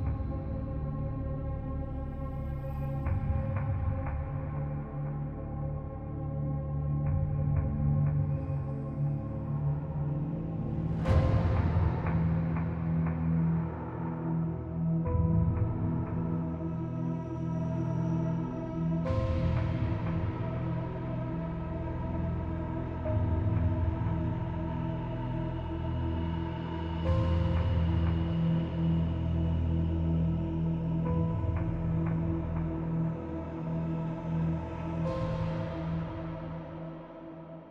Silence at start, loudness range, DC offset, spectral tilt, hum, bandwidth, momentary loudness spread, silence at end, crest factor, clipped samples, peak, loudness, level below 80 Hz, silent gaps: 0 s; 5 LU; under 0.1%; -10 dB/octave; none; 5.2 kHz; 8 LU; 0 s; 16 dB; under 0.1%; -14 dBFS; -32 LUFS; -42 dBFS; none